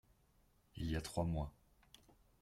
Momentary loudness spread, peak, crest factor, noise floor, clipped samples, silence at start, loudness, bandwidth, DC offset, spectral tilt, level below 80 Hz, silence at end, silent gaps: 10 LU; -26 dBFS; 20 dB; -73 dBFS; under 0.1%; 0.75 s; -43 LUFS; 15.5 kHz; under 0.1%; -6 dB/octave; -54 dBFS; 0.9 s; none